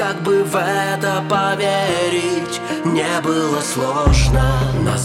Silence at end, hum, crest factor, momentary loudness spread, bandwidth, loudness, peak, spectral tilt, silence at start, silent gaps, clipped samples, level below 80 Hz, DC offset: 0 s; none; 16 dB; 4 LU; 16 kHz; -17 LUFS; 0 dBFS; -5 dB/octave; 0 s; none; under 0.1%; -26 dBFS; under 0.1%